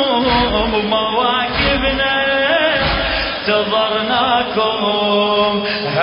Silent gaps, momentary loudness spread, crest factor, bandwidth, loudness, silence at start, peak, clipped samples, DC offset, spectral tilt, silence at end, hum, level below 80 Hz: none; 3 LU; 14 dB; 5.4 kHz; -15 LUFS; 0 s; -2 dBFS; under 0.1%; under 0.1%; -9 dB/octave; 0 s; none; -32 dBFS